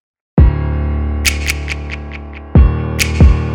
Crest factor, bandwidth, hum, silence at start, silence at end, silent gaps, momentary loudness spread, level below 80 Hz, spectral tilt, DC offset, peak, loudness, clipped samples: 12 dB; 17 kHz; none; 0.35 s; 0 s; none; 14 LU; -16 dBFS; -5.5 dB/octave; under 0.1%; 0 dBFS; -14 LUFS; under 0.1%